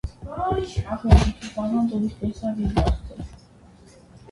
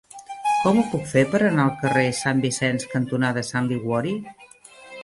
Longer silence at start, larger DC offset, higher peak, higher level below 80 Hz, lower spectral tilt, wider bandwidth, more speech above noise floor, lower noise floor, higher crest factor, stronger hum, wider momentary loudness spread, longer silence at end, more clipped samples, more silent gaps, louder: about the same, 0.05 s vs 0.15 s; neither; first, 0 dBFS vs -4 dBFS; first, -28 dBFS vs -58 dBFS; first, -7.5 dB/octave vs -5.5 dB/octave; about the same, 11.5 kHz vs 11.5 kHz; about the same, 28 dB vs 25 dB; about the same, -50 dBFS vs -47 dBFS; first, 24 dB vs 18 dB; neither; first, 15 LU vs 9 LU; first, 0.15 s vs 0 s; neither; neither; about the same, -24 LUFS vs -22 LUFS